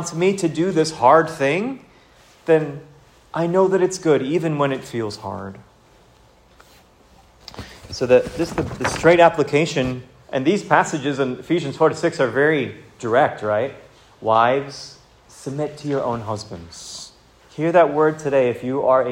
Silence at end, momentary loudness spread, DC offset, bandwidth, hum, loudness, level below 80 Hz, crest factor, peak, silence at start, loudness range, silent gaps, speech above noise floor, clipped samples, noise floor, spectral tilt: 0 s; 18 LU; under 0.1%; 15.5 kHz; none; -19 LUFS; -52 dBFS; 20 dB; 0 dBFS; 0 s; 7 LU; none; 33 dB; under 0.1%; -52 dBFS; -5.5 dB/octave